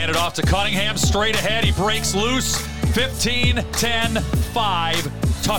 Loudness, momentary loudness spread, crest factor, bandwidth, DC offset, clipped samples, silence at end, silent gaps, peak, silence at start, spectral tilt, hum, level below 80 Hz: -20 LUFS; 4 LU; 14 dB; 19 kHz; 3%; under 0.1%; 0 s; none; -6 dBFS; 0 s; -3.5 dB/octave; none; -28 dBFS